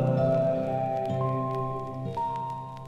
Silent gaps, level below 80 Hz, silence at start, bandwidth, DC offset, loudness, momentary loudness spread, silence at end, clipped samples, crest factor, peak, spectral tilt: none; -56 dBFS; 0 s; 7.4 kHz; under 0.1%; -29 LUFS; 9 LU; 0 s; under 0.1%; 14 dB; -14 dBFS; -9.5 dB/octave